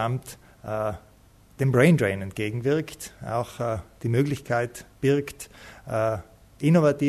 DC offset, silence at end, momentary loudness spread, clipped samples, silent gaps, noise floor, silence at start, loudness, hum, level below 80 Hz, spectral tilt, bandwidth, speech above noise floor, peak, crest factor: under 0.1%; 0 s; 18 LU; under 0.1%; none; -54 dBFS; 0 s; -25 LUFS; none; -54 dBFS; -7 dB/octave; 13.5 kHz; 30 dB; -6 dBFS; 18 dB